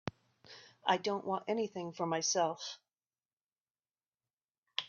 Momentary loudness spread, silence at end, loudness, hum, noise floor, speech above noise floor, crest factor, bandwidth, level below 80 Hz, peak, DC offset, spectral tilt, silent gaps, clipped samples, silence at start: 21 LU; 0 s; -36 LUFS; none; under -90 dBFS; over 55 dB; 24 dB; 7.2 kHz; -80 dBFS; -16 dBFS; under 0.1%; -2.5 dB/octave; 3.33-3.37 s, 3.43-3.65 s, 3.71-3.75 s, 4.33-4.37 s, 4.44-4.48 s, 4.58-4.63 s; under 0.1%; 0.05 s